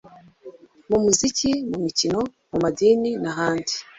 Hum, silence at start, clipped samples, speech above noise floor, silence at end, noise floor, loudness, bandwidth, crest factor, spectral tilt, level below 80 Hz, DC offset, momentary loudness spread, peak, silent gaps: none; 0.05 s; under 0.1%; 24 dB; 0.15 s; -45 dBFS; -22 LUFS; 8.4 kHz; 20 dB; -3.5 dB/octave; -52 dBFS; under 0.1%; 7 LU; -2 dBFS; none